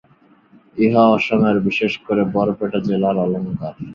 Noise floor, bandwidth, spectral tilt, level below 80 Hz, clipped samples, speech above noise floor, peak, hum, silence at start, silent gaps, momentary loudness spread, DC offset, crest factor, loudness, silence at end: -53 dBFS; 7 kHz; -8 dB/octave; -54 dBFS; under 0.1%; 36 dB; -2 dBFS; none; 0.75 s; none; 10 LU; under 0.1%; 16 dB; -18 LUFS; 0 s